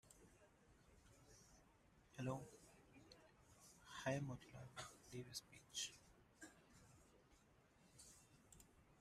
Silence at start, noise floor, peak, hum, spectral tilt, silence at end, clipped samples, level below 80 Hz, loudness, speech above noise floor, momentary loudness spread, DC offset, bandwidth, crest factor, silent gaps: 0.05 s; -74 dBFS; -30 dBFS; none; -4 dB/octave; 0 s; under 0.1%; -78 dBFS; -53 LUFS; 23 dB; 20 LU; under 0.1%; 15 kHz; 26 dB; none